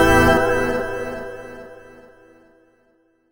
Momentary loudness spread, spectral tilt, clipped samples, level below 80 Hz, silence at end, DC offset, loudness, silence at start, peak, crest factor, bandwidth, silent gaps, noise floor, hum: 24 LU; -5 dB/octave; under 0.1%; -34 dBFS; 1.5 s; under 0.1%; -19 LUFS; 0 s; -2 dBFS; 20 dB; over 20 kHz; none; -61 dBFS; none